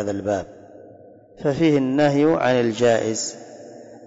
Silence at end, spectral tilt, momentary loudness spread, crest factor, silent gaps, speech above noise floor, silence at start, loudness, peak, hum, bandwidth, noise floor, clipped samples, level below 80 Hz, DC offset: 0 s; -5.5 dB/octave; 22 LU; 12 dB; none; 27 dB; 0 s; -20 LUFS; -8 dBFS; none; 8 kHz; -46 dBFS; under 0.1%; -58 dBFS; under 0.1%